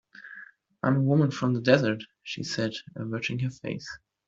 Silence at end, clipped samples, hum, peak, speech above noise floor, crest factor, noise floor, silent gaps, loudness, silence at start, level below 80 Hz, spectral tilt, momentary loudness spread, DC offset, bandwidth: 0.3 s; under 0.1%; none; -4 dBFS; 23 dB; 24 dB; -49 dBFS; none; -27 LUFS; 0.15 s; -64 dBFS; -6.5 dB/octave; 20 LU; under 0.1%; 7.8 kHz